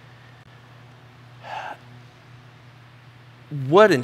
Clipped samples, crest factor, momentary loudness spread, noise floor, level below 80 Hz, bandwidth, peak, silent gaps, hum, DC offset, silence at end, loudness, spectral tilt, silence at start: under 0.1%; 24 dB; 31 LU; -48 dBFS; -68 dBFS; 13 kHz; -2 dBFS; none; none; under 0.1%; 0 s; -21 LUFS; -6 dB/octave; 1.45 s